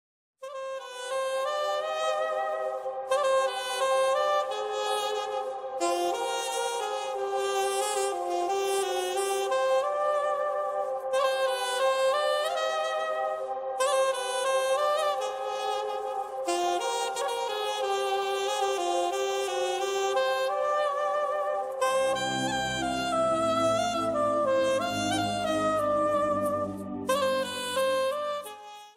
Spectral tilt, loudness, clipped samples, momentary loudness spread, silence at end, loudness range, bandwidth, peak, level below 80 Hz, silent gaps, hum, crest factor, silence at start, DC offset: -2.5 dB/octave; -28 LUFS; under 0.1%; 6 LU; 0.05 s; 3 LU; 16 kHz; -14 dBFS; -64 dBFS; none; none; 14 dB; 0.4 s; under 0.1%